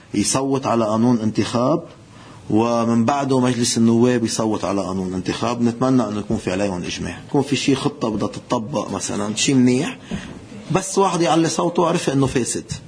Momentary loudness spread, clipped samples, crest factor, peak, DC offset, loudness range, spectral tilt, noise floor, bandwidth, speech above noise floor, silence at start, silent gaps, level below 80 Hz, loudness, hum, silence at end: 8 LU; under 0.1%; 18 dB; -2 dBFS; under 0.1%; 3 LU; -5 dB/octave; -41 dBFS; 10.5 kHz; 22 dB; 0.15 s; none; -50 dBFS; -19 LUFS; none; 0 s